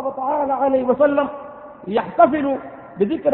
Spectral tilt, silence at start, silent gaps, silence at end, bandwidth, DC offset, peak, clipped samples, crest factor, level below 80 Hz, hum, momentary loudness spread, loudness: -11 dB/octave; 0 s; none; 0 s; 4.2 kHz; under 0.1%; 0 dBFS; under 0.1%; 18 dB; -56 dBFS; none; 19 LU; -19 LUFS